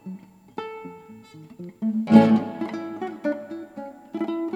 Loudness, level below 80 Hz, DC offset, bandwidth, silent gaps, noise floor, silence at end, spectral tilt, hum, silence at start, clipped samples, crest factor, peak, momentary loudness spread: -22 LUFS; -72 dBFS; under 0.1%; 7.6 kHz; none; -45 dBFS; 0 s; -8 dB/octave; none; 0.05 s; under 0.1%; 24 dB; 0 dBFS; 25 LU